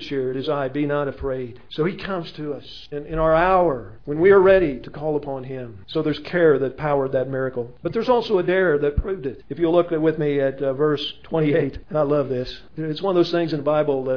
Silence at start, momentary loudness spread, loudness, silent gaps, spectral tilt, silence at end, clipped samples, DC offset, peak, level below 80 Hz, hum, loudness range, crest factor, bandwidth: 0 s; 13 LU; -21 LUFS; none; -8 dB/octave; 0 s; under 0.1%; 0.7%; -4 dBFS; -42 dBFS; none; 4 LU; 16 dB; 5.4 kHz